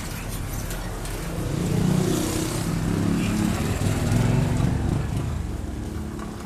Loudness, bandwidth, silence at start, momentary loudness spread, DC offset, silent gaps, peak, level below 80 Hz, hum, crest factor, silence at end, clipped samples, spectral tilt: -25 LUFS; 15 kHz; 0 s; 10 LU; under 0.1%; none; -10 dBFS; -34 dBFS; none; 16 dB; 0 s; under 0.1%; -6 dB/octave